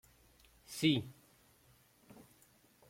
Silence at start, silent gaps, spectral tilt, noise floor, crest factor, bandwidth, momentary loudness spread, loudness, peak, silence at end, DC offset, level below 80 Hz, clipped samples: 0.7 s; none; -5 dB/octave; -68 dBFS; 22 dB; 16.5 kHz; 27 LU; -35 LUFS; -18 dBFS; 1.75 s; under 0.1%; -72 dBFS; under 0.1%